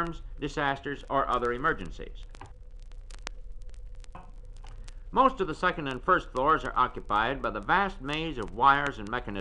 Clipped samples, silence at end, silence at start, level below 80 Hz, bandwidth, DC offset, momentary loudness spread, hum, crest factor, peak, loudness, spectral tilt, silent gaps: under 0.1%; 0 s; 0 s; -42 dBFS; 10.5 kHz; under 0.1%; 24 LU; none; 22 dB; -8 dBFS; -28 LUFS; -5.5 dB/octave; none